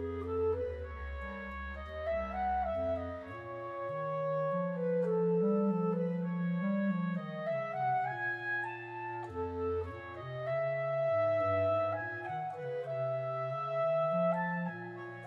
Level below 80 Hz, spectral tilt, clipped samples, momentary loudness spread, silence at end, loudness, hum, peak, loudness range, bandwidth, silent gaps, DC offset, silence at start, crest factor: -54 dBFS; -9 dB/octave; under 0.1%; 11 LU; 0 s; -35 LUFS; none; -22 dBFS; 4 LU; 5.8 kHz; none; under 0.1%; 0 s; 12 dB